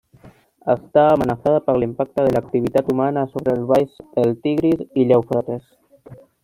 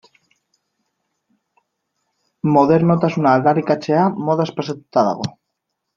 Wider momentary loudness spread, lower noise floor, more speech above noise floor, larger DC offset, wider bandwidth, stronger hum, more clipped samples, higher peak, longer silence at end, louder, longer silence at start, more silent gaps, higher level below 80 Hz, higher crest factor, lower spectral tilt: second, 7 LU vs 10 LU; second, -48 dBFS vs -77 dBFS; second, 30 dB vs 61 dB; neither; first, 15.5 kHz vs 7.4 kHz; neither; neither; about the same, -2 dBFS vs -2 dBFS; second, 0.3 s vs 0.65 s; about the same, -19 LUFS vs -17 LUFS; second, 0.25 s vs 2.45 s; neither; first, -52 dBFS vs -60 dBFS; about the same, 16 dB vs 18 dB; about the same, -8.5 dB/octave vs -8 dB/octave